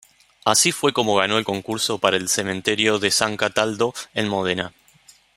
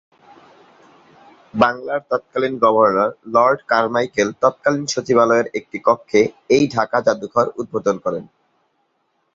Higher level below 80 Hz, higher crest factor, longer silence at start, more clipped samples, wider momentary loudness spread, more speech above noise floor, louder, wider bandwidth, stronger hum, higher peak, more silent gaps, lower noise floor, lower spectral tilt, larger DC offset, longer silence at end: about the same, -62 dBFS vs -58 dBFS; about the same, 20 dB vs 18 dB; second, 0.45 s vs 1.55 s; neither; about the same, 8 LU vs 8 LU; second, 32 dB vs 50 dB; about the same, -20 LUFS vs -18 LUFS; first, 16 kHz vs 7.8 kHz; neither; about the same, -2 dBFS vs 0 dBFS; neither; second, -53 dBFS vs -67 dBFS; second, -2.5 dB/octave vs -5 dB/octave; neither; second, 0.65 s vs 1.1 s